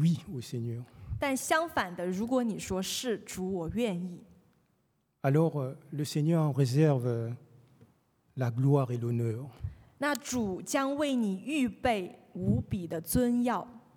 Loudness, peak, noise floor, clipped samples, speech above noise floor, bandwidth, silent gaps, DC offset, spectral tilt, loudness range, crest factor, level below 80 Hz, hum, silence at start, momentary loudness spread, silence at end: -31 LUFS; -12 dBFS; -74 dBFS; under 0.1%; 44 dB; 19.5 kHz; none; under 0.1%; -6 dB/octave; 3 LU; 18 dB; -56 dBFS; none; 0 s; 12 LU; 0.2 s